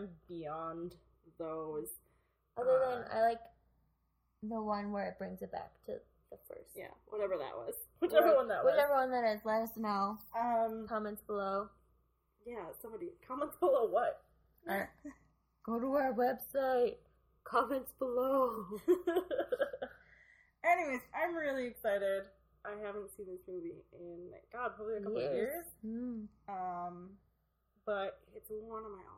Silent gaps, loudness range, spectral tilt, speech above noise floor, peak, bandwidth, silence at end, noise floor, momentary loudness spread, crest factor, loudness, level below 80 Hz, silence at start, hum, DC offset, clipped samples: none; 10 LU; -5.5 dB/octave; 42 dB; -14 dBFS; 16 kHz; 0 s; -78 dBFS; 18 LU; 22 dB; -36 LUFS; -70 dBFS; 0 s; none; under 0.1%; under 0.1%